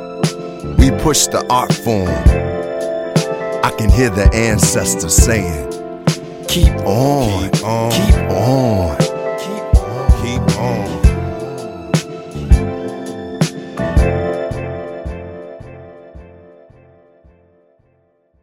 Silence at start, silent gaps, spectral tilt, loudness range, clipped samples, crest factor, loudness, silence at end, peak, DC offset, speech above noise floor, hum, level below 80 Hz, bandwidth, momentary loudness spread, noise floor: 0 s; none; -5 dB/octave; 8 LU; under 0.1%; 16 dB; -16 LUFS; 2.05 s; 0 dBFS; under 0.1%; 45 dB; none; -20 dBFS; 16.5 kHz; 14 LU; -58 dBFS